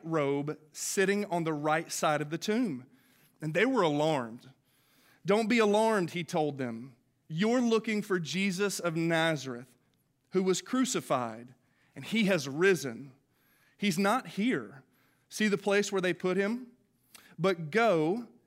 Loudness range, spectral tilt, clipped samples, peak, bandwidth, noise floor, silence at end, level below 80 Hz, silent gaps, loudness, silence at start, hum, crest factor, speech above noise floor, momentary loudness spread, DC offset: 3 LU; -4.5 dB/octave; under 0.1%; -14 dBFS; 16 kHz; -73 dBFS; 0.2 s; -82 dBFS; none; -30 LUFS; 0.05 s; none; 18 dB; 43 dB; 13 LU; under 0.1%